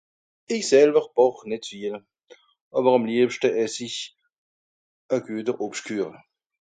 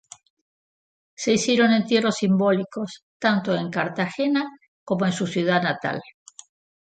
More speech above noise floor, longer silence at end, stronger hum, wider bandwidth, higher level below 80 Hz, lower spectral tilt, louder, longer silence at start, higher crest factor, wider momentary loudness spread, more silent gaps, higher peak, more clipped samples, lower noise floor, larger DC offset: second, 32 dB vs over 68 dB; about the same, 0.6 s vs 0.7 s; neither; about the same, 9.4 kHz vs 9.2 kHz; second, -74 dBFS vs -68 dBFS; about the same, -4 dB/octave vs -5 dB/octave; about the same, -23 LUFS vs -22 LUFS; second, 0.5 s vs 1.2 s; about the same, 20 dB vs 18 dB; first, 15 LU vs 11 LU; first, 2.61-2.71 s, 4.38-5.09 s vs 3.03-3.20 s, 4.68-4.87 s; about the same, -4 dBFS vs -6 dBFS; neither; second, -54 dBFS vs under -90 dBFS; neither